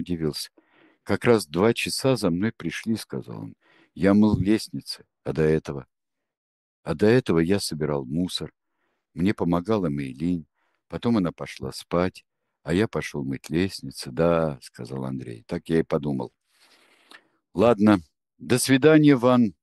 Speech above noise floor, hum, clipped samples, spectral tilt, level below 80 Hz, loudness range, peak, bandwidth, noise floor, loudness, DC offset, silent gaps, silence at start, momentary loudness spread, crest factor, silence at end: 53 dB; none; under 0.1%; -6 dB/octave; -52 dBFS; 4 LU; -2 dBFS; 12.5 kHz; -76 dBFS; -24 LUFS; under 0.1%; 6.37-6.83 s; 0 s; 17 LU; 22 dB; 0.1 s